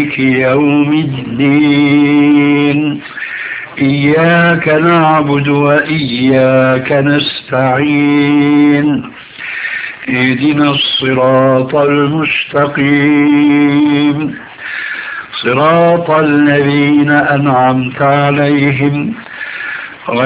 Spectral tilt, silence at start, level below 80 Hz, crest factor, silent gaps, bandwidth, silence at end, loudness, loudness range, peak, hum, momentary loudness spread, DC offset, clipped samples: -10 dB/octave; 0 s; -48 dBFS; 10 dB; none; 4 kHz; 0 s; -10 LUFS; 2 LU; 0 dBFS; none; 11 LU; under 0.1%; 0.3%